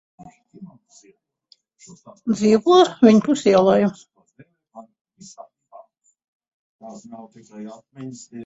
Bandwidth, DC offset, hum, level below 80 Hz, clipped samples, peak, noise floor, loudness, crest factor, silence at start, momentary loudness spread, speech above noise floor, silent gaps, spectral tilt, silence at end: 8 kHz; under 0.1%; none; -64 dBFS; under 0.1%; -2 dBFS; -59 dBFS; -16 LUFS; 20 dB; 0.6 s; 26 LU; 40 dB; 5.01-5.05 s, 6.28-6.40 s, 6.48-6.79 s; -6 dB/octave; 0 s